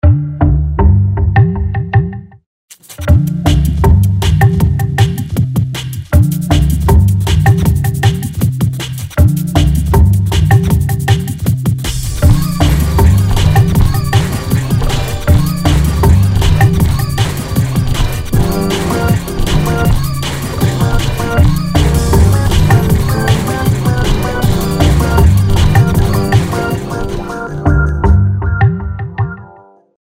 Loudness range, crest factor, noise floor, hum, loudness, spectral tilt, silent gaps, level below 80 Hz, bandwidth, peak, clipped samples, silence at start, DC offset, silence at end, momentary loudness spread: 2 LU; 10 dB; -40 dBFS; none; -12 LUFS; -6.5 dB/octave; 2.46-2.68 s; -18 dBFS; 16.5 kHz; 0 dBFS; under 0.1%; 0.05 s; under 0.1%; 0.5 s; 7 LU